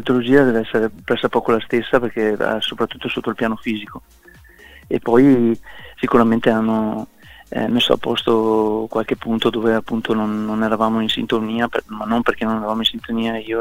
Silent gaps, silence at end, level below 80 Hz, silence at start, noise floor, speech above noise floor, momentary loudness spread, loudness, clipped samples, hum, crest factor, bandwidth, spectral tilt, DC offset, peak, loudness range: none; 0 s; -48 dBFS; 0 s; -44 dBFS; 26 dB; 10 LU; -18 LUFS; under 0.1%; none; 18 dB; 16 kHz; -6 dB/octave; under 0.1%; 0 dBFS; 3 LU